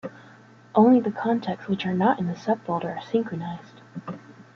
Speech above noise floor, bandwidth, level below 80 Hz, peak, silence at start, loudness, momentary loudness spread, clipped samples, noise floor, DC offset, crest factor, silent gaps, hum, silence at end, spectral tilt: 27 dB; 6.8 kHz; -66 dBFS; -6 dBFS; 0.05 s; -24 LUFS; 21 LU; under 0.1%; -50 dBFS; under 0.1%; 18 dB; none; none; 0.15 s; -8 dB/octave